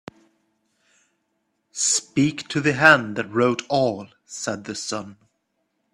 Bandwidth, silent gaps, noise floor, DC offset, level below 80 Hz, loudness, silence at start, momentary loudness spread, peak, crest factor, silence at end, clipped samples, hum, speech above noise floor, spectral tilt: 13 kHz; none; -73 dBFS; under 0.1%; -64 dBFS; -21 LUFS; 1.75 s; 18 LU; 0 dBFS; 24 dB; 0.8 s; under 0.1%; none; 52 dB; -3.5 dB/octave